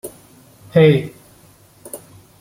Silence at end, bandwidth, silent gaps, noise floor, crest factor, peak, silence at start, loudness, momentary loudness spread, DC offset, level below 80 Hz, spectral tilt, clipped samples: 0.45 s; 16.5 kHz; none; -49 dBFS; 18 dB; -2 dBFS; 0.05 s; -15 LUFS; 23 LU; under 0.1%; -56 dBFS; -7 dB/octave; under 0.1%